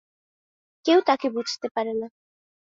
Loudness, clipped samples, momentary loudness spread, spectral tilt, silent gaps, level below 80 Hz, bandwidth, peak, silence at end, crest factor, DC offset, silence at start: -24 LUFS; under 0.1%; 12 LU; -3.5 dB/octave; 1.71-1.75 s; -76 dBFS; 7.6 kHz; -8 dBFS; 0.7 s; 20 dB; under 0.1%; 0.85 s